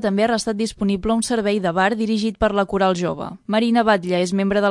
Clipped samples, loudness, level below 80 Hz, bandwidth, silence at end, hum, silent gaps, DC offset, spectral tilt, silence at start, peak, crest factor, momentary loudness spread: under 0.1%; -20 LUFS; -44 dBFS; 11.5 kHz; 0 s; none; none; under 0.1%; -5 dB/octave; 0 s; -2 dBFS; 16 dB; 5 LU